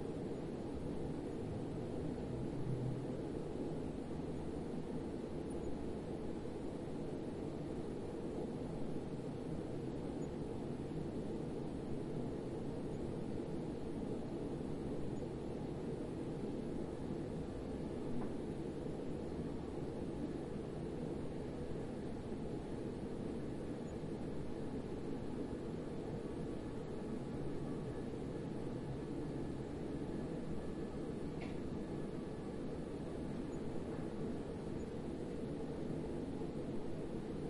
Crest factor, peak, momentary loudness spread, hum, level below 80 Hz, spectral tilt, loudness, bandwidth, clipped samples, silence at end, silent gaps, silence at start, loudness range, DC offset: 16 dB; -28 dBFS; 2 LU; none; -56 dBFS; -8 dB/octave; -44 LUFS; 11.5 kHz; under 0.1%; 0 s; none; 0 s; 1 LU; under 0.1%